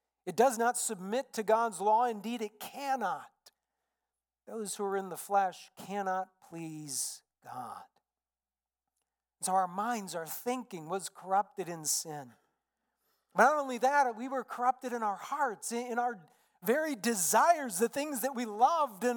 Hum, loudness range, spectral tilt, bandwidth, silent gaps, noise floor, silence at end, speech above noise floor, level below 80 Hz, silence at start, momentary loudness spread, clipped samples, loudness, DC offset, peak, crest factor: none; 7 LU; -3 dB/octave; 19 kHz; none; under -90 dBFS; 0 s; over 58 dB; under -90 dBFS; 0.25 s; 15 LU; under 0.1%; -32 LUFS; under 0.1%; -12 dBFS; 22 dB